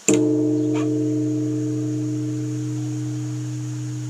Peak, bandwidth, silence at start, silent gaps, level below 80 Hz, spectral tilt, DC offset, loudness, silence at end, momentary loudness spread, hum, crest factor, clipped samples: 0 dBFS; 14.5 kHz; 0 s; none; -64 dBFS; -6.5 dB/octave; under 0.1%; -23 LUFS; 0 s; 9 LU; none; 22 dB; under 0.1%